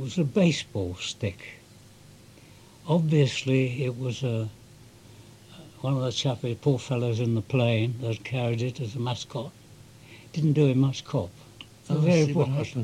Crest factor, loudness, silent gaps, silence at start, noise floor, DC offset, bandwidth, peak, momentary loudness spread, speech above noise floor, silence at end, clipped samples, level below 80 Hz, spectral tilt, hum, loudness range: 18 dB; -27 LUFS; none; 0 s; -51 dBFS; under 0.1%; 12 kHz; -10 dBFS; 15 LU; 26 dB; 0 s; under 0.1%; -62 dBFS; -6.5 dB/octave; none; 3 LU